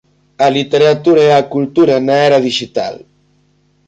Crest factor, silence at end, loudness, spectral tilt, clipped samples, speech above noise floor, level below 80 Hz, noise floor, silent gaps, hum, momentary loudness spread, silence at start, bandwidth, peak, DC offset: 12 dB; 0.9 s; -12 LUFS; -5.5 dB/octave; under 0.1%; 44 dB; -56 dBFS; -55 dBFS; none; 50 Hz at -40 dBFS; 9 LU; 0.4 s; 8.8 kHz; -2 dBFS; under 0.1%